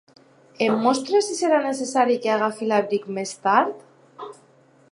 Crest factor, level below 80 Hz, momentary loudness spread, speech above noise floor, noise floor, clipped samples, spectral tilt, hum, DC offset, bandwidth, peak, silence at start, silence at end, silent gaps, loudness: 20 dB; -80 dBFS; 20 LU; 34 dB; -55 dBFS; under 0.1%; -4 dB/octave; none; under 0.1%; 11.5 kHz; -4 dBFS; 0.6 s; 0.6 s; none; -22 LUFS